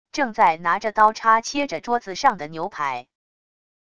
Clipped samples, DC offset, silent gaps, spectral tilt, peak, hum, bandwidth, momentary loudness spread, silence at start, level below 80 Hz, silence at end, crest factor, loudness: under 0.1%; 0.5%; none; -3 dB/octave; -2 dBFS; none; 9.8 kHz; 10 LU; 0.15 s; -60 dBFS; 0.8 s; 20 dB; -21 LUFS